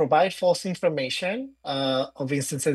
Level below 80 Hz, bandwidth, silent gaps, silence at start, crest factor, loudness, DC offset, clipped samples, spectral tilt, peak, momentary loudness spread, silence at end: -68 dBFS; 12.5 kHz; none; 0 s; 16 dB; -25 LUFS; under 0.1%; under 0.1%; -4.5 dB/octave; -8 dBFS; 8 LU; 0 s